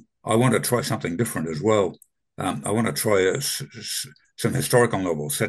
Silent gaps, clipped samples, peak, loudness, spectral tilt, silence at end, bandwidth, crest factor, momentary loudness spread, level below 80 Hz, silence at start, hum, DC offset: none; under 0.1%; -4 dBFS; -23 LUFS; -4.5 dB/octave; 0 s; 13 kHz; 18 dB; 9 LU; -58 dBFS; 0.25 s; none; under 0.1%